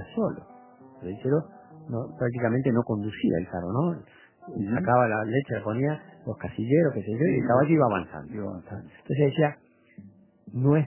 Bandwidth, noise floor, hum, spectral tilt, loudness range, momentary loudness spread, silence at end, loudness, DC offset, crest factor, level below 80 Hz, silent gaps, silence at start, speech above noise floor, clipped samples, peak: 3.2 kHz; -50 dBFS; none; -12 dB/octave; 4 LU; 16 LU; 0 s; -26 LUFS; under 0.1%; 18 dB; -56 dBFS; none; 0 s; 25 dB; under 0.1%; -8 dBFS